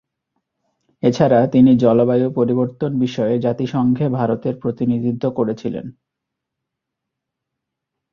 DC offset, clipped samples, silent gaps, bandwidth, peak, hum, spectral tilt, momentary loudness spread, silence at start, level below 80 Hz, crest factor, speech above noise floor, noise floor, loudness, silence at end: under 0.1%; under 0.1%; none; 6.8 kHz; -2 dBFS; none; -8.5 dB/octave; 9 LU; 1.05 s; -56 dBFS; 18 dB; 64 dB; -81 dBFS; -17 LUFS; 2.2 s